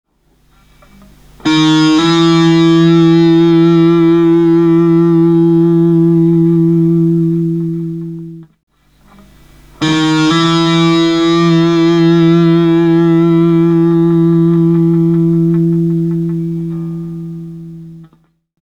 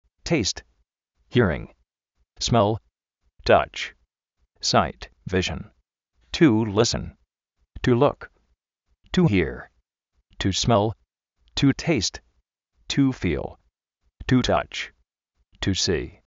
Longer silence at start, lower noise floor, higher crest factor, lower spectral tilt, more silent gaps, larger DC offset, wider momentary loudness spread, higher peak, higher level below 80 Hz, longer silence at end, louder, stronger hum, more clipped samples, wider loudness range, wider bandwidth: first, 1.45 s vs 0.25 s; second, -53 dBFS vs -73 dBFS; second, 10 dB vs 22 dB; first, -7.5 dB/octave vs -4.5 dB/octave; first, 8.63-8.67 s vs none; neither; about the same, 12 LU vs 14 LU; about the same, 0 dBFS vs -2 dBFS; about the same, -44 dBFS vs -44 dBFS; first, 0.6 s vs 0.2 s; first, -10 LUFS vs -23 LUFS; neither; neither; first, 7 LU vs 2 LU; about the same, 8.4 kHz vs 8 kHz